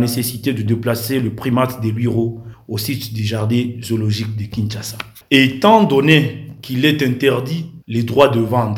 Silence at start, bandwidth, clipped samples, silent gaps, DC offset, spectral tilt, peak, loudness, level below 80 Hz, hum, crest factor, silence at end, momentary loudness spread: 0 s; 18 kHz; under 0.1%; none; under 0.1%; -6 dB/octave; 0 dBFS; -17 LUFS; -52 dBFS; none; 16 dB; 0 s; 13 LU